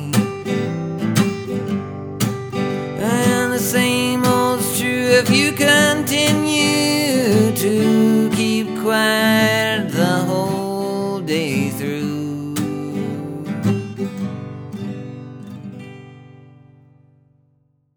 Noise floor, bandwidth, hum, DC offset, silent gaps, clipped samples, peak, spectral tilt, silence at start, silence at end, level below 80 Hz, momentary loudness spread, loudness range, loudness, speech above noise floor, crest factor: -61 dBFS; over 20 kHz; 50 Hz at -55 dBFS; under 0.1%; none; under 0.1%; 0 dBFS; -4.5 dB/octave; 0 s; 1.6 s; -56 dBFS; 15 LU; 12 LU; -18 LUFS; 46 dB; 18 dB